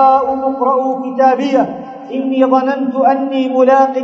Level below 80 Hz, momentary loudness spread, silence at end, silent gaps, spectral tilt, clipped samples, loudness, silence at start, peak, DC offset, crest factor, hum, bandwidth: -58 dBFS; 8 LU; 0 s; none; -6 dB/octave; under 0.1%; -13 LUFS; 0 s; 0 dBFS; under 0.1%; 12 dB; none; 6.8 kHz